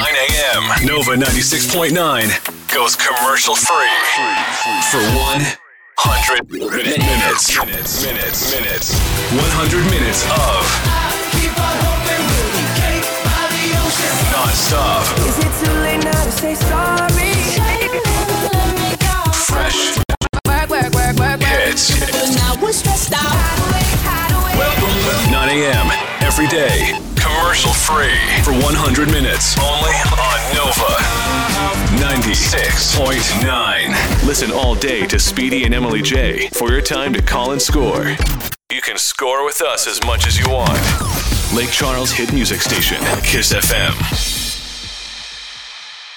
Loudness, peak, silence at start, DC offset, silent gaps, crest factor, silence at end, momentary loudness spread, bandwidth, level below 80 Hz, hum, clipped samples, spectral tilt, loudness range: -14 LUFS; -4 dBFS; 0 s; under 0.1%; 20.17-20.21 s; 12 dB; 0 s; 4 LU; over 20 kHz; -22 dBFS; none; under 0.1%; -3 dB/octave; 2 LU